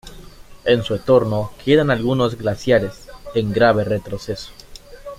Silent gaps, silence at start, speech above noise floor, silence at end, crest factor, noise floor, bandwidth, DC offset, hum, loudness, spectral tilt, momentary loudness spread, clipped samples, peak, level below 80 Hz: none; 0.05 s; 22 dB; 0.05 s; 18 dB; -39 dBFS; 15.5 kHz; under 0.1%; none; -18 LUFS; -6.5 dB/octave; 14 LU; under 0.1%; -2 dBFS; -42 dBFS